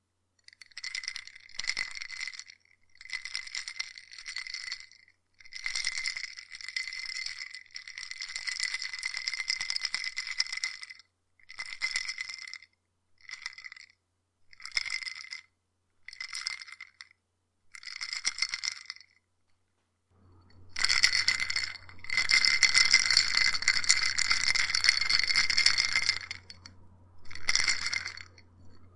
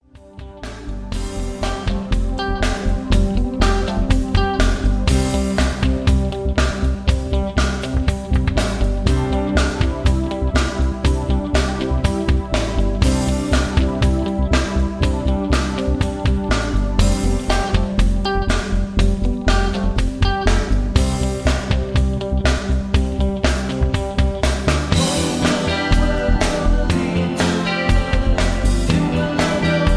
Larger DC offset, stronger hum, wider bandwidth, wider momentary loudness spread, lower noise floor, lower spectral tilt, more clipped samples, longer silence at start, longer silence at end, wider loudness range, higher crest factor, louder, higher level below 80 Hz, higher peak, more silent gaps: neither; neither; about the same, 11.5 kHz vs 11 kHz; first, 21 LU vs 3 LU; first, -77 dBFS vs -37 dBFS; second, 2 dB/octave vs -5.5 dB/octave; neither; first, 0.75 s vs 0.35 s; about the same, 0.1 s vs 0 s; first, 15 LU vs 1 LU; first, 30 dB vs 16 dB; second, -28 LUFS vs -19 LUFS; second, -60 dBFS vs -20 dBFS; about the same, -2 dBFS vs 0 dBFS; neither